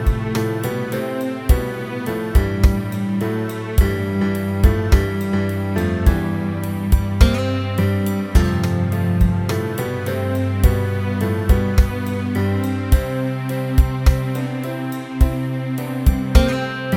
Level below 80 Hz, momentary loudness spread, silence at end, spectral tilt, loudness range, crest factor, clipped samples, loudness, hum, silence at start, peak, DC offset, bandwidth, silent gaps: -22 dBFS; 7 LU; 0 s; -7 dB/octave; 2 LU; 18 dB; under 0.1%; -20 LUFS; none; 0 s; 0 dBFS; under 0.1%; 17.5 kHz; none